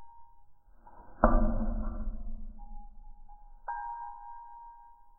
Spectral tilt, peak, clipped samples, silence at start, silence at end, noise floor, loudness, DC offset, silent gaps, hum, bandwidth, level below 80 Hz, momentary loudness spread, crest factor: -13 dB/octave; -8 dBFS; under 0.1%; 0 s; 0.1 s; -53 dBFS; -34 LUFS; under 0.1%; none; none; 1.8 kHz; -36 dBFS; 26 LU; 26 dB